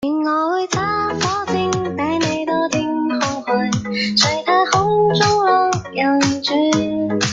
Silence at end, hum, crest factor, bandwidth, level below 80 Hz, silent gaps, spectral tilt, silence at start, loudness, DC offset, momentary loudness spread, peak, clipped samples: 0 s; none; 16 dB; 9.4 kHz; -50 dBFS; none; -4 dB/octave; 0 s; -17 LUFS; under 0.1%; 5 LU; 0 dBFS; under 0.1%